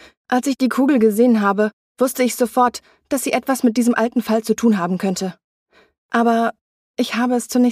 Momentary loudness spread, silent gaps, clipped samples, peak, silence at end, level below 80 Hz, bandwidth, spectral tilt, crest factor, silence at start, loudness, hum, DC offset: 8 LU; 1.73-1.95 s, 5.44-5.66 s, 5.98-6.09 s, 6.61-6.94 s; under 0.1%; -4 dBFS; 0 s; -62 dBFS; 15.5 kHz; -5 dB/octave; 14 dB; 0.3 s; -18 LUFS; none; under 0.1%